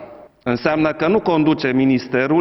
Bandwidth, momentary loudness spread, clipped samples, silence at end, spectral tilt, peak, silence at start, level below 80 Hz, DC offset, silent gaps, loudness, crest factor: 6 kHz; 5 LU; under 0.1%; 0 s; -8 dB/octave; -2 dBFS; 0 s; -50 dBFS; under 0.1%; none; -17 LUFS; 14 dB